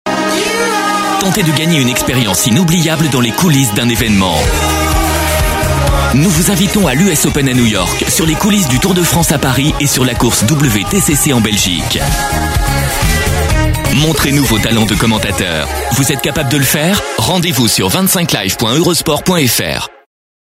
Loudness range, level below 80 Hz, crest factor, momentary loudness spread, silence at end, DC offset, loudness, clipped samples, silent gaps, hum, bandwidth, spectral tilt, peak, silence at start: 1 LU; -22 dBFS; 12 dB; 3 LU; 0.55 s; under 0.1%; -11 LUFS; under 0.1%; none; none; 16.5 kHz; -4 dB/octave; 0 dBFS; 0.05 s